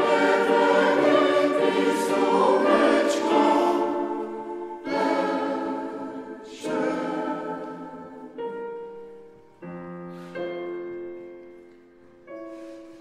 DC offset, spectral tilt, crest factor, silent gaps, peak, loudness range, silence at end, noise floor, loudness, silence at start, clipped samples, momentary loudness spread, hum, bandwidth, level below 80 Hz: under 0.1%; -4.5 dB/octave; 18 dB; none; -6 dBFS; 17 LU; 0 s; -52 dBFS; -23 LUFS; 0 s; under 0.1%; 21 LU; none; 14.5 kHz; -70 dBFS